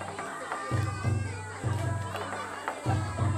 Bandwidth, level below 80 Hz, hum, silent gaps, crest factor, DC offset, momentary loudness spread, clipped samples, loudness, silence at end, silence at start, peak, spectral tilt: 13 kHz; -52 dBFS; none; none; 18 dB; under 0.1%; 5 LU; under 0.1%; -33 LUFS; 0 s; 0 s; -14 dBFS; -6 dB/octave